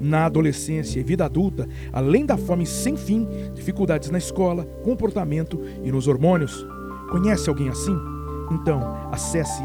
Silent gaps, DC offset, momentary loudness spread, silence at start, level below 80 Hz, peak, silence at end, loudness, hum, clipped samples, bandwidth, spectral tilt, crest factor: none; under 0.1%; 9 LU; 0 s; -36 dBFS; -4 dBFS; 0 s; -23 LUFS; none; under 0.1%; 19.5 kHz; -6.5 dB/octave; 18 dB